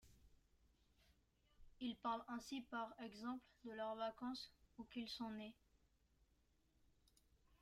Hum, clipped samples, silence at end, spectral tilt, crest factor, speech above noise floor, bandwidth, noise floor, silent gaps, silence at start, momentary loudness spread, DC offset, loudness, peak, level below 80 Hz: none; under 0.1%; 0.05 s; -4.5 dB/octave; 20 dB; 30 dB; 15 kHz; -80 dBFS; none; 0.05 s; 8 LU; under 0.1%; -50 LUFS; -34 dBFS; -76 dBFS